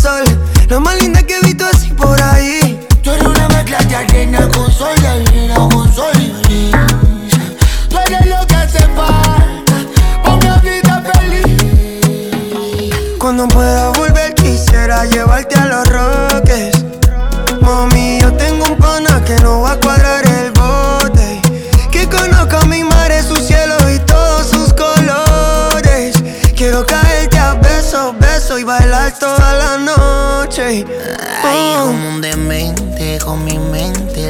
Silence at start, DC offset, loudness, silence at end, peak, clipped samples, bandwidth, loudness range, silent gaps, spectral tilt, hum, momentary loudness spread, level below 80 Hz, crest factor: 0 s; under 0.1%; -11 LUFS; 0 s; 0 dBFS; 0.3%; 19.5 kHz; 2 LU; none; -5 dB/octave; none; 6 LU; -12 dBFS; 8 dB